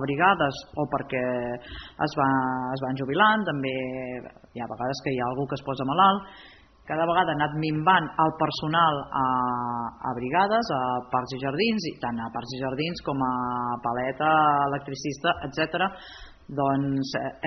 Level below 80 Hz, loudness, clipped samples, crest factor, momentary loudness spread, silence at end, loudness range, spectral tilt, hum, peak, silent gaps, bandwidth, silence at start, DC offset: -56 dBFS; -26 LUFS; under 0.1%; 20 dB; 12 LU; 0 s; 3 LU; -3.5 dB/octave; none; -6 dBFS; none; 6.4 kHz; 0 s; under 0.1%